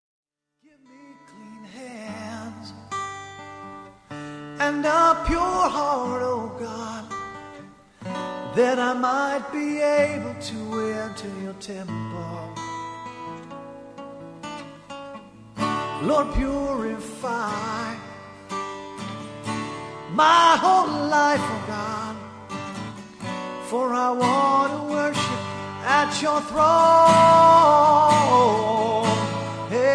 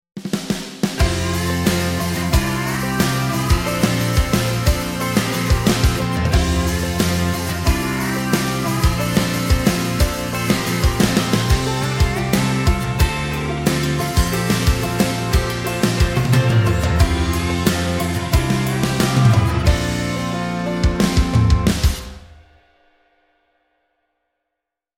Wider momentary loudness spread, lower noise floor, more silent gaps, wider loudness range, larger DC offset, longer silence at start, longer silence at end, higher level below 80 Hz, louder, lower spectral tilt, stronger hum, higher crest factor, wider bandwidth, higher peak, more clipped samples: first, 23 LU vs 5 LU; second, -62 dBFS vs -82 dBFS; neither; first, 19 LU vs 2 LU; neither; first, 1.1 s vs 0.15 s; second, 0 s vs 2.65 s; second, -46 dBFS vs -24 dBFS; second, -21 LUFS vs -18 LUFS; about the same, -4.5 dB/octave vs -5 dB/octave; neither; about the same, 18 dB vs 18 dB; second, 11 kHz vs 17 kHz; second, -4 dBFS vs 0 dBFS; neither